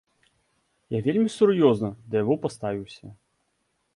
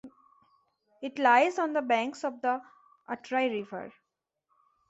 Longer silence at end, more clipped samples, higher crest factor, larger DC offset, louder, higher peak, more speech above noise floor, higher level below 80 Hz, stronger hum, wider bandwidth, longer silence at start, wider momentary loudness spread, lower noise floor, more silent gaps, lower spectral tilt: second, 0.8 s vs 1 s; neither; about the same, 20 dB vs 22 dB; neither; first, -24 LUFS vs -28 LUFS; first, -6 dBFS vs -10 dBFS; second, 50 dB vs 56 dB; first, -62 dBFS vs -80 dBFS; neither; first, 11.5 kHz vs 8.2 kHz; first, 0.9 s vs 0.05 s; second, 14 LU vs 18 LU; second, -73 dBFS vs -84 dBFS; neither; first, -7 dB/octave vs -4 dB/octave